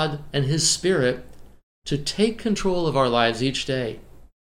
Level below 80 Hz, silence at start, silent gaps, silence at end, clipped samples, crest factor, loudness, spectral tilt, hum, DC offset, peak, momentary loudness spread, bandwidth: -44 dBFS; 0 s; 1.63-1.82 s; 0.25 s; under 0.1%; 18 dB; -22 LUFS; -4 dB/octave; none; under 0.1%; -4 dBFS; 11 LU; 16 kHz